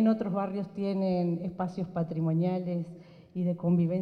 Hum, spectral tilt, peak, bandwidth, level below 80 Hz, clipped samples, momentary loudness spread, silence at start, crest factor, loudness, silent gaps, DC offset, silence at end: none; -10.5 dB/octave; -14 dBFS; 5.2 kHz; -68 dBFS; under 0.1%; 8 LU; 0 s; 14 dB; -31 LUFS; none; under 0.1%; 0 s